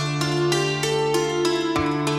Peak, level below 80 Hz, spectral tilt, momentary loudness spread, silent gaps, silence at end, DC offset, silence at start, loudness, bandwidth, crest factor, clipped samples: -8 dBFS; -50 dBFS; -4.5 dB/octave; 1 LU; none; 0 s; under 0.1%; 0 s; -22 LUFS; 16 kHz; 14 dB; under 0.1%